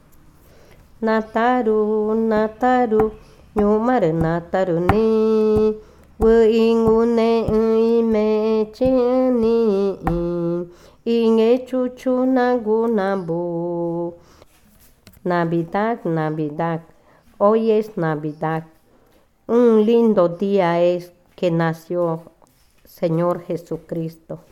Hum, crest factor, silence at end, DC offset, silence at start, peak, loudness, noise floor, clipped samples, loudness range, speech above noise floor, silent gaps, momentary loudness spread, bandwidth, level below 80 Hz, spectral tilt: none; 18 dB; 0.15 s; under 0.1%; 1 s; 0 dBFS; -19 LUFS; -55 dBFS; under 0.1%; 7 LU; 38 dB; none; 10 LU; 13 kHz; -42 dBFS; -8 dB/octave